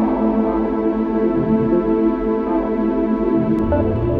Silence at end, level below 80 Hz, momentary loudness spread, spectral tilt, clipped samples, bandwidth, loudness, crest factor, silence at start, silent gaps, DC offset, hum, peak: 0 s; -34 dBFS; 3 LU; -11 dB/octave; under 0.1%; 4.5 kHz; -18 LUFS; 12 dB; 0 s; none; under 0.1%; none; -6 dBFS